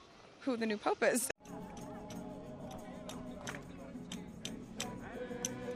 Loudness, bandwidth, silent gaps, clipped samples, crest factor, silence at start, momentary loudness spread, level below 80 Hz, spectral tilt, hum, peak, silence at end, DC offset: -40 LUFS; 15 kHz; none; under 0.1%; 22 dB; 0 s; 15 LU; -64 dBFS; -3.5 dB/octave; none; -18 dBFS; 0 s; under 0.1%